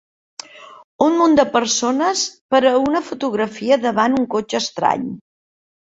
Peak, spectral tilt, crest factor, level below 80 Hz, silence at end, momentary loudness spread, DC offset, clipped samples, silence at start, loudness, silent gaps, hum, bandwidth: -2 dBFS; -3 dB/octave; 16 dB; -58 dBFS; 0.7 s; 17 LU; under 0.1%; under 0.1%; 0.55 s; -17 LUFS; 0.84-0.99 s, 2.41-2.49 s; none; 8 kHz